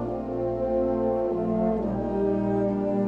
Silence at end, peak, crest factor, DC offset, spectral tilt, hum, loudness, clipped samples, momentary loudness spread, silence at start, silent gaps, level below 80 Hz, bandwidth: 0 s; -12 dBFS; 14 dB; under 0.1%; -10.5 dB/octave; none; -26 LUFS; under 0.1%; 3 LU; 0 s; none; -44 dBFS; 5.4 kHz